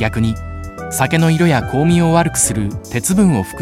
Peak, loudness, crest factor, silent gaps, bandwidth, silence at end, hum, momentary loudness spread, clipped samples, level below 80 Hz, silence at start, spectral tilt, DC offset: 0 dBFS; -15 LUFS; 14 dB; none; 16 kHz; 0 s; none; 10 LU; under 0.1%; -34 dBFS; 0 s; -5 dB/octave; under 0.1%